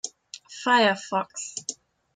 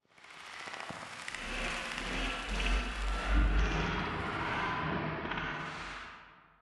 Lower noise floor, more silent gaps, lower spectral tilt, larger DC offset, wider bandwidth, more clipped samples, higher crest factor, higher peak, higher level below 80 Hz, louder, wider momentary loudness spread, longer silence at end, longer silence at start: second, -46 dBFS vs -55 dBFS; neither; second, -2 dB/octave vs -4.5 dB/octave; neither; second, 9.6 kHz vs 11.5 kHz; neither; about the same, 18 dB vs 18 dB; first, -8 dBFS vs -18 dBFS; second, -78 dBFS vs -38 dBFS; first, -24 LUFS vs -36 LUFS; first, 18 LU vs 12 LU; first, 0.4 s vs 0.2 s; second, 0.05 s vs 0.2 s